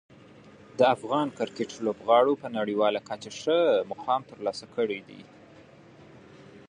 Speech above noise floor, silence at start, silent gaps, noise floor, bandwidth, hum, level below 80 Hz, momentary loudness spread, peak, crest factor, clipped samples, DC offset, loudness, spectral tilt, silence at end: 26 dB; 0.75 s; none; -52 dBFS; 10 kHz; none; -72 dBFS; 11 LU; -8 dBFS; 20 dB; under 0.1%; under 0.1%; -27 LUFS; -5 dB/octave; 0.1 s